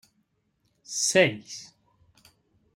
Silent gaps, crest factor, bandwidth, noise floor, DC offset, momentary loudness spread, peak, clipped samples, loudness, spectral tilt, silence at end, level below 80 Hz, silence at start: none; 24 dB; 16 kHz; -73 dBFS; under 0.1%; 20 LU; -6 dBFS; under 0.1%; -23 LUFS; -2.5 dB/octave; 1.1 s; -74 dBFS; 0.9 s